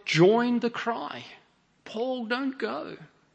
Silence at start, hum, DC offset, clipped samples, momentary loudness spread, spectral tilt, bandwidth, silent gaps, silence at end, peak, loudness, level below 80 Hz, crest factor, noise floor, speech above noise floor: 0.05 s; none; under 0.1%; under 0.1%; 21 LU; -6 dB/octave; 8.6 kHz; none; 0.3 s; -8 dBFS; -27 LUFS; -76 dBFS; 20 dB; -51 dBFS; 25 dB